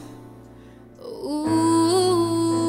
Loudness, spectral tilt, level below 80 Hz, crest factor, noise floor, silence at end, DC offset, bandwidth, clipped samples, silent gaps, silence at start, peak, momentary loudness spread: -20 LUFS; -5 dB/octave; -56 dBFS; 12 dB; -45 dBFS; 0 s; under 0.1%; 15.5 kHz; under 0.1%; none; 0 s; -10 dBFS; 21 LU